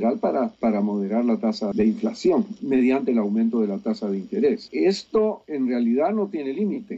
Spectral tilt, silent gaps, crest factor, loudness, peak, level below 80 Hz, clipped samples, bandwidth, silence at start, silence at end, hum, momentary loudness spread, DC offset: -7 dB/octave; none; 12 dB; -23 LUFS; -10 dBFS; -62 dBFS; under 0.1%; 8 kHz; 0 s; 0 s; none; 5 LU; under 0.1%